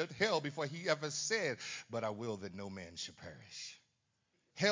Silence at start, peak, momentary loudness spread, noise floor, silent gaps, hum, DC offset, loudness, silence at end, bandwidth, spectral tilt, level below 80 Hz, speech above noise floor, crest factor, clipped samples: 0 s; -16 dBFS; 14 LU; -81 dBFS; none; none; under 0.1%; -39 LUFS; 0 s; 7.6 kHz; -3 dB/octave; -72 dBFS; 41 dB; 22 dB; under 0.1%